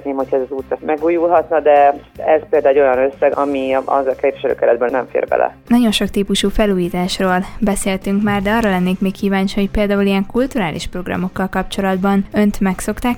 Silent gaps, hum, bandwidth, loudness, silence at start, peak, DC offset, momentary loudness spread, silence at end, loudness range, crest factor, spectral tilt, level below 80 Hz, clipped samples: none; none; 17 kHz; -16 LUFS; 0 s; 0 dBFS; under 0.1%; 7 LU; 0 s; 3 LU; 14 dB; -5.5 dB/octave; -34 dBFS; under 0.1%